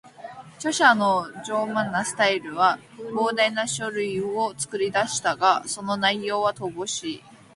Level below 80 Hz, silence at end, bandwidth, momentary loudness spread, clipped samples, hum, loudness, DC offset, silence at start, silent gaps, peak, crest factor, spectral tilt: -66 dBFS; 0.2 s; 11.5 kHz; 11 LU; under 0.1%; none; -23 LUFS; under 0.1%; 0.05 s; none; -4 dBFS; 20 dB; -2.5 dB/octave